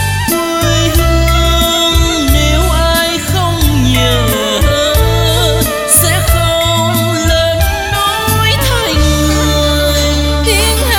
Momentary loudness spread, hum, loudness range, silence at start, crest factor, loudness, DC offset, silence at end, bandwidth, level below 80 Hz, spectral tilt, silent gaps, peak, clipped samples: 3 LU; none; 1 LU; 0 s; 10 dB; -11 LUFS; under 0.1%; 0 s; 19 kHz; -16 dBFS; -4 dB/octave; none; 0 dBFS; under 0.1%